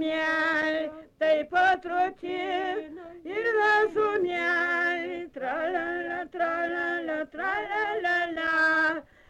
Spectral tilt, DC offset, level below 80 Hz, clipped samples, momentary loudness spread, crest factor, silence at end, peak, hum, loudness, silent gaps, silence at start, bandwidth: -4 dB/octave; under 0.1%; -64 dBFS; under 0.1%; 10 LU; 14 dB; 0.3 s; -14 dBFS; none; -27 LUFS; none; 0 s; 11 kHz